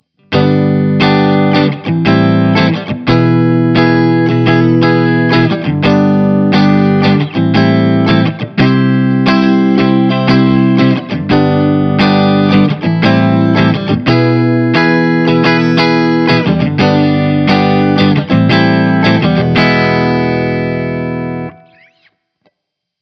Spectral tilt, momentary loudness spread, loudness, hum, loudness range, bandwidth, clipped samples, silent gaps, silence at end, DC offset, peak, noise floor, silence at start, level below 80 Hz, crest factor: -8 dB/octave; 4 LU; -10 LUFS; none; 1 LU; 6.4 kHz; under 0.1%; none; 1.5 s; under 0.1%; 0 dBFS; -74 dBFS; 0.3 s; -42 dBFS; 10 dB